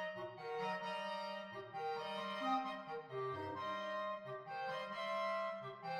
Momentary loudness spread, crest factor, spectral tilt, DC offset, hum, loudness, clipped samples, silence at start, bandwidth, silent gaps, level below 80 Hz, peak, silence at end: 8 LU; 16 dB; -5 dB/octave; under 0.1%; none; -43 LUFS; under 0.1%; 0 s; 15.5 kHz; none; -86 dBFS; -28 dBFS; 0 s